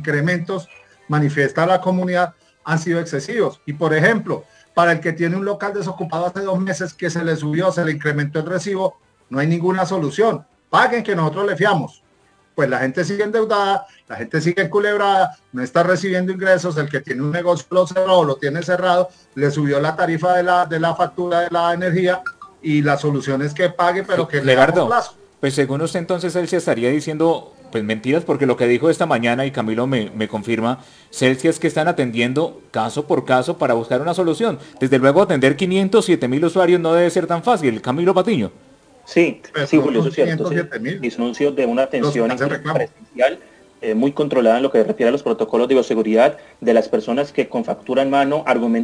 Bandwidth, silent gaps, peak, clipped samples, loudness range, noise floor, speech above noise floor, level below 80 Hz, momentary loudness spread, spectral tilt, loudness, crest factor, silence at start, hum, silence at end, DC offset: 10.5 kHz; none; -2 dBFS; under 0.1%; 3 LU; -57 dBFS; 39 dB; -62 dBFS; 8 LU; -6 dB/octave; -18 LUFS; 16 dB; 0 s; none; 0 s; under 0.1%